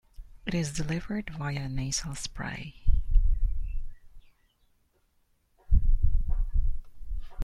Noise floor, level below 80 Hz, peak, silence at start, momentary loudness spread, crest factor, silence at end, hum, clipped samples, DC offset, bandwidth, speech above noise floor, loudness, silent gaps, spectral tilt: -69 dBFS; -28 dBFS; -8 dBFS; 0.2 s; 13 LU; 18 dB; 0 s; none; under 0.1%; under 0.1%; 11 kHz; 37 dB; -33 LUFS; none; -4.5 dB/octave